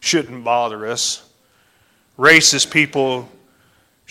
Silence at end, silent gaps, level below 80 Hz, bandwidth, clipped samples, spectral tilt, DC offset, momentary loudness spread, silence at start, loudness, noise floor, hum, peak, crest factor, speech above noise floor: 0.85 s; none; -60 dBFS; 16 kHz; under 0.1%; -2 dB/octave; under 0.1%; 13 LU; 0 s; -15 LUFS; -58 dBFS; none; 0 dBFS; 18 dB; 41 dB